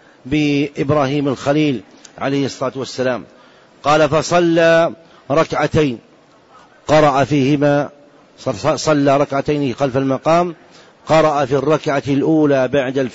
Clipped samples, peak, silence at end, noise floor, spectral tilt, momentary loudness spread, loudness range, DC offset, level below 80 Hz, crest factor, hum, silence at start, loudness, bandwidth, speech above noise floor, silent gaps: under 0.1%; -4 dBFS; 0 s; -47 dBFS; -6 dB/octave; 10 LU; 3 LU; under 0.1%; -46 dBFS; 12 dB; none; 0.25 s; -16 LUFS; 8 kHz; 32 dB; none